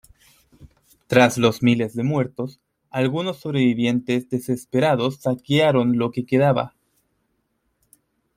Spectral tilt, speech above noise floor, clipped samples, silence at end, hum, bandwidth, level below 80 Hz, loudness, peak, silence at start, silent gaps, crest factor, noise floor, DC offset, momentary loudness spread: -6.5 dB/octave; 51 dB; under 0.1%; 1.7 s; none; 15.5 kHz; -58 dBFS; -21 LUFS; -2 dBFS; 0.6 s; none; 20 dB; -71 dBFS; under 0.1%; 9 LU